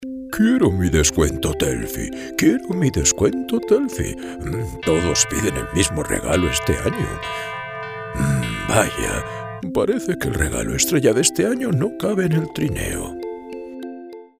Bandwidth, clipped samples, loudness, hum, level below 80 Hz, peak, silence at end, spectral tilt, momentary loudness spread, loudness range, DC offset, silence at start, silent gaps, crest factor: 16 kHz; under 0.1%; -20 LUFS; none; -36 dBFS; 0 dBFS; 0.15 s; -4.5 dB/octave; 13 LU; 3 LU; under 0.1%; 0 s; none; 20 dB